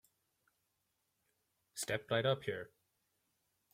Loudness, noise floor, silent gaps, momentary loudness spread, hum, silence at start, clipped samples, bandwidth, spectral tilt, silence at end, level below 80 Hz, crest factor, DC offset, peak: -38 LUFS; -84 dBFS; none; 16 LU; none; 1.75 s; under 0.1%; 16.5 kHz; -4 dB/octave; 1.05 s; -78 dBFS; 22 dB; under 0.1%; -20 dBFS